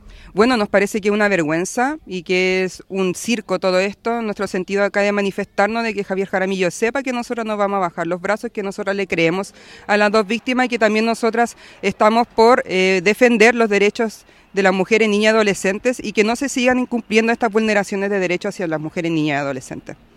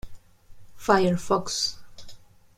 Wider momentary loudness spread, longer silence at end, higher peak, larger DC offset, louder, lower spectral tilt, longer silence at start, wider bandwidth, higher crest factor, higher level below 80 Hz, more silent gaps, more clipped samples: about the same, 9 LU vs 11 LU; second, 0.2 s vs 0.35 s; first, 0 dBFS vs -4 dBFS; neither; first, -18 LUFS vs -24 LUFS; about the same, -4.5 dB/octave vs -4 dB/octave; about the same, 0.05 s vs 0.05 s; second, 14 kHz vs 15.5 kHz; about the same, 18 dB vs 22 dB; about the same, -54 dBFS vs -50 dBFS; neither; neither